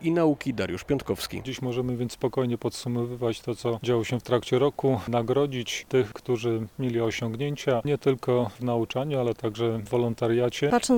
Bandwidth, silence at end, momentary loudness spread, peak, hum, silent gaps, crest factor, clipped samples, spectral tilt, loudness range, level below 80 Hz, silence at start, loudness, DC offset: 19.5 kHz; 0 s; 6 LU; -8 dBFS; none; none; 18 dB; under 0.1%; -6 dB/octave; 3 LU; -56 dBFS; 0 s; -27 LUFS; under 0.1%